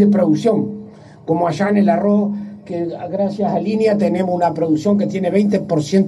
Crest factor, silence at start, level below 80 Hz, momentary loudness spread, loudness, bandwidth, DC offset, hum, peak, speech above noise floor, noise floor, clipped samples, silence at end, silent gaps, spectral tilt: 14 dB; 0 s; -60 dBFS; 10 LU; -17 LUFS; 11 kHz; under 0.1%; none; -2 dBFS; 21 dB; -37 dBFS; under 0.1%; 0 s; none; -7.5 dB/octave